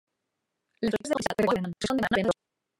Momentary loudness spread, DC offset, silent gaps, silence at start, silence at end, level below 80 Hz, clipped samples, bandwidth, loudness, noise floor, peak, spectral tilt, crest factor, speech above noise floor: 5 LU; under 0.1%; none; 0.8 s; 0.45 s; -58 dBFS; under 0.1%; 16 kHz; -28 LUFS; -83 dBFS; -8 dBFS; -5 dB/octave; 20 dB; 56 dB